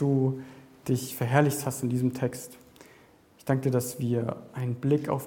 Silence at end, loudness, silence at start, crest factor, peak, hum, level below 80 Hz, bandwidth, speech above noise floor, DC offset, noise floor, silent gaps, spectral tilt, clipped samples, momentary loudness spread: 0 s; -28 LUFS; 0 s; 22 dB; -6 dBFS; none; -66 dBFS; 17.5 kHz; 30 dB; under 0.1%; -57 dBFS; none; -6.5 dB/octave; under 0.1%; 15 LU